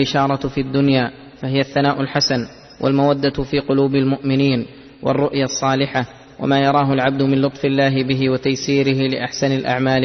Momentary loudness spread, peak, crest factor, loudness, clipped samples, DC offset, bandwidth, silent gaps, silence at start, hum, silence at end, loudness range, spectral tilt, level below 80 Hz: 7 LU; -2 dBFS; 14 dB; -18 LUFS; under 0.1%; under 0.1%; 6.4 kHz; none; 0 s; none; 0 s; 1 LU; -5.5 dB/octave; -46 dBFS